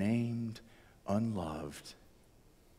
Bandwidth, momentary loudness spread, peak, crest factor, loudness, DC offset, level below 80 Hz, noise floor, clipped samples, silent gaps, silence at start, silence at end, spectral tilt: 14.5 kHz; 18 LU; -22 dBFS; 16 dB; -38 LUFS; under 0.1%; -62 dBFS; -63 dBFS; under 0.1%; none; 0 s; 0.85 s; -7 dB/octave